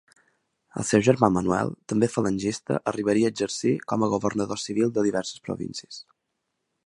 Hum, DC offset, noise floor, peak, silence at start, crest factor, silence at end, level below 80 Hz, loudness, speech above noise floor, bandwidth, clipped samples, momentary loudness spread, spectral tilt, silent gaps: none; under 0.1%; -79 dBFS; -2 dBFS; 0.75 s; 24 dB; 0.85 s; -56 dBFS; -25 LUFS; 55 dB; 11.5 kHz; under 0.1%; 12 LU; -5.5 dB/octave; none